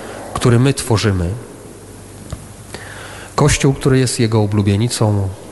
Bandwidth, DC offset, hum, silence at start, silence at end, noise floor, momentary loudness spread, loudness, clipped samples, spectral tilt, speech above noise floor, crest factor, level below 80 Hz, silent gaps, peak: 12.5 kHz; under 0.1%; none; 0 s; 0 s; -35 dBFS; 21 LU; -15 LUFS; under 0.1%; -5.5 dB/octave; 21 dB; 14 dB; -36 dBFS; none; -2 dBFS